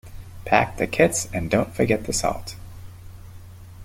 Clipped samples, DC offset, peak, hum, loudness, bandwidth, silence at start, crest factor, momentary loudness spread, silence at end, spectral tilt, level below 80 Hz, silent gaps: under 0.1%; under 0.1%; -2 dBFS; none; -22 LUFS; 16.5 kHz; 0.05 s; 22 dB; 23 LU; 0 s; -4.5 dB/octave; -42 dBFS; none